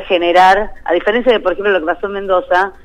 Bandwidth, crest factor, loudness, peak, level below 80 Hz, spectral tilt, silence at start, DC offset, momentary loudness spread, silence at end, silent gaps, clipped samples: 12 kHz; 12 dB; -13 LUFS; -2 dBFS; -38 dBFS; -4.5 dB/octave; 0 s; under 0.1%; 8 LU; 0.15 s; none; under 0.1%